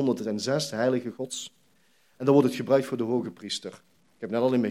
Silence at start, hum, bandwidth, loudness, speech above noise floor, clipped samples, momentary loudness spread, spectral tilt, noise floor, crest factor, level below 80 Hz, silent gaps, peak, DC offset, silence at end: 0 s; none; 15 kHz; -27 LUFS; 40 dB; under 0.1%; 13 LU; -5.5 dB/octave; -66 dBFS; 20 dB; -78 dBFS; none; -6 dBFS; under 0.1%; 0 s